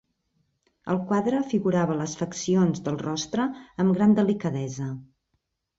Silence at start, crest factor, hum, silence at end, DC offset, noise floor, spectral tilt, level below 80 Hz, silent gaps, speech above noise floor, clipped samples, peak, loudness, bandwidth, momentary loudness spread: 0.85 s; 16 dB; none; 0.75 s; under 0.1%; -76 dBFS; -6.5 dB/octave; -62 dBFS; none; 52 dB; under 0.1%; -10 dBFS; -25 LUFS; 7.8 kHz; 11 LU